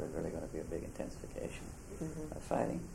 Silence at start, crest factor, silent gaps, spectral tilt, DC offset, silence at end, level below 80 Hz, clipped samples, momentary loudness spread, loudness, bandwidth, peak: 0 s; 22 dB; none; -6.5 dB/octave; under 0.1%; 0 s; -52 dBFS; under 0.1%; 9 LU; -42 LUFS; 16 kHz; -20 dBFS